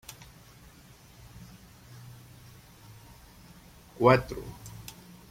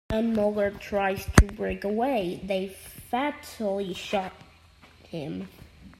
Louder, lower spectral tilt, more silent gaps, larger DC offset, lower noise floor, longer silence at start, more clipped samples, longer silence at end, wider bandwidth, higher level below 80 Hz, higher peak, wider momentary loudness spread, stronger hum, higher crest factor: first, -25 LUFS vs -28 LUFS; about the same, -6 dB/octave vs -5.5 dB/octave; neither; neither; about the same, -54 dBFS vs -54 dBFS; first, 4 s vs 0.1 s; neither; first, 0.6 s vs 0.05 s; about the same, 16.5 kHz vs 15.5 kHz; second, -56 dBFS vs -36 dBFS; second, -6 dBFS vs 0 dBFS; first, 29 LU vs 16 LU; neither; about the same, 28 dB vs 28 dB